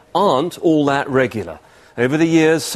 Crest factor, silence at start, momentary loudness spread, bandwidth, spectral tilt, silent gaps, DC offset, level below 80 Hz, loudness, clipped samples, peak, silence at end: 16 dB; 0.15 s; 13 LU; 14 kHz; -5.5 dB/octave; none; under 0.1%; -54 dBFS; -16 LUFS; under 0.1%; -2 dBFS; 0 s